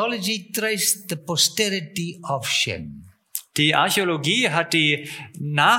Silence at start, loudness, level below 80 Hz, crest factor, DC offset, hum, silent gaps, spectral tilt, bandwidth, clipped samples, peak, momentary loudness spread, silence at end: 0 s; -21 LUFS; -60 dBFS; 18 dB; under 0.1%; none; none; -2.5 dB/octave; 17 kHz; under 0.1%; -4 dBFS; 13 LU; 0 s